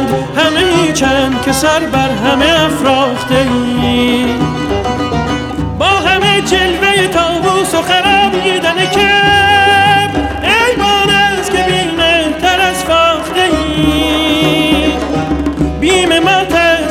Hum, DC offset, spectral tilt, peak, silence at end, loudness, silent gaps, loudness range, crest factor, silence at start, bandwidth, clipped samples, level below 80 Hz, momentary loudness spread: none; under 0.1%; -4 dB/octave; -2 dBFS; 0 s; -10 LUFS; none; 3 LU; 10 dB; 0 s; 17.5 kHz; under 0.1%; -28 dBFS; 6 LU